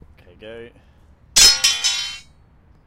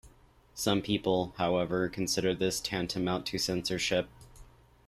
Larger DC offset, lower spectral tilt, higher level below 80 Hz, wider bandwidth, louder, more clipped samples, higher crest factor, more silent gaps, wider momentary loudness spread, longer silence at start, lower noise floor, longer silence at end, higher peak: neither; second, 2 dB/octave vs -4 dB/octave; first, -42 dBFS vs -56 dBFS; about the same, 16 kHz vs 15.5 kHz; first, -13 LUFS vs -31 LUFS; neither; about the same, 20 dB vs 18 dB; neither; first, 18 LU vs 4 LU; first, 0.45 s vs 0.05 s; second, -51 dBFS vs -60 dBFS; first, 0.65 s vs 0.45 s; first, 0 dBFS vs -14 dBFS